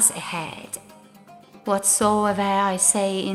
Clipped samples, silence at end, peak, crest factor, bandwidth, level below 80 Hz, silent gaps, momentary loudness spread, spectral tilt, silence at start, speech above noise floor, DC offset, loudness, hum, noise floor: under 0.1%; 0 s; -4 dBFS; 20 dB; 15.5 kHz; -58 dBFS; none; 17 LU; -2.5 dB/octave; 0 s; 26 dB; under 0.1%; -20 LUFS; none; -48 dBFS